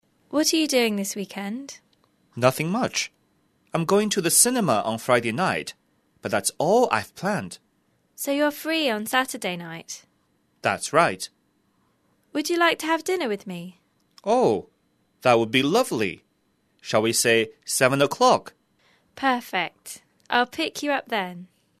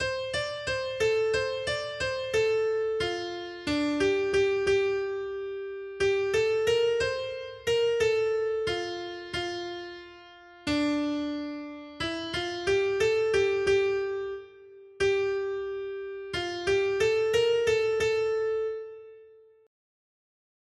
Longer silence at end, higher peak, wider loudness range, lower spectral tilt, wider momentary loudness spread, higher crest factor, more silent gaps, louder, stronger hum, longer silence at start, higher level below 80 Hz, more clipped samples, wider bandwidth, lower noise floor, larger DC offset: second, 0.35 s vs 1.4 s; first, -2 dBFS vs -14 dBFS; about the same, 5 LU vs 4 LU; about the same, -3 dB/octave vs -4 dB/octave; first, 17 LU vs 11 LU; first, 24 dB vs 14 dB; neither; first, -23 LUFS vs -28 LUFS; neither; first, 0.3 s vs 0 s; second, -68 dBFS vs -56 dBFS; neither; about the same, 13.5 kHz vs 12.5 kHz; first, -68 dBFS vs -55 dBFS; neither